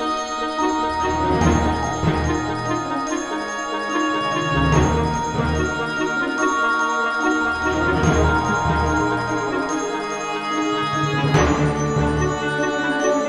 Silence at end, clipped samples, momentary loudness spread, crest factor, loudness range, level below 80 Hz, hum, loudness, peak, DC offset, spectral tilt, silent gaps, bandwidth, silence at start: 0 s; under 0.1%; 6 LU; 16 dB; 2 LU; -32 dBFS; none; -20 LUFS; -4 dBFS; under 0.1%; -5.5 dB/octave; none; 11.5 kHz; 0 s